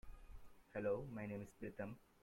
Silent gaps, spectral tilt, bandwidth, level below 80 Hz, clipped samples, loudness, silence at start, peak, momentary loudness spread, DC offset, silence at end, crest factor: none; -8 dB/octave; 16.5 kHz; -64 dBFS; under 0.1%; -48 LUFS; 0.05 s; -30 dBFS; 21 LU; under 0.1%; 0.2 s; 18 dB